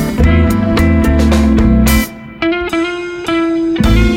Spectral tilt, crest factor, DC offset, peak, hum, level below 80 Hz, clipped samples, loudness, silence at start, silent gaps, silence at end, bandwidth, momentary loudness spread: -6.5 dB/octave; 10 dB; under 0.1%; 0 dBFS; none; -16 dBFS; under 0.1%; -12 LUFS; 0 s; none; 0 s; 17 kHz; 7 LU